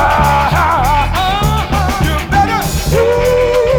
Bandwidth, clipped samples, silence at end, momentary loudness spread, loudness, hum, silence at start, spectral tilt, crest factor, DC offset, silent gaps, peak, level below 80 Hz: over 20 kHz; under 0.1%; 0 s; 3 LU; -12 LUFS; none; 0 s; -5 dB/octave; 12 dB; under 0.1%; none; 0 dBFS; -20 dBFS